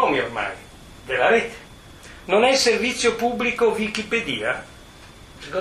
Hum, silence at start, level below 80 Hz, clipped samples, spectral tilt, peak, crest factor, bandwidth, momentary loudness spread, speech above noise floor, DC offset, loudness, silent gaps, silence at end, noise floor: none; 0 s; -50 dBFS; under 0.1%; -3 dB/octave; -4 dBFS; 20 dB; 14.5 kHz; 22 LU; 23 dB; under 0.1%; -21 LUFS; none; 0 s; -44 dBFS